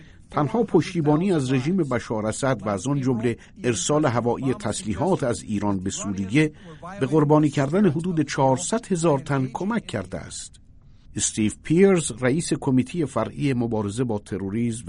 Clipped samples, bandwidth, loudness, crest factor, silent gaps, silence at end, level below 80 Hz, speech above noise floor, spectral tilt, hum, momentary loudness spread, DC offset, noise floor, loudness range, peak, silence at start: under 0.1%; 11 kHz; -23 LUFS; 18 dB; none; 0 s; -50 dBFS; 26 dB; -5.5 dB/octave; none; 9 LU; under 0.1%; -48 dBFS; 3 LU; -6 dBFS; 0 s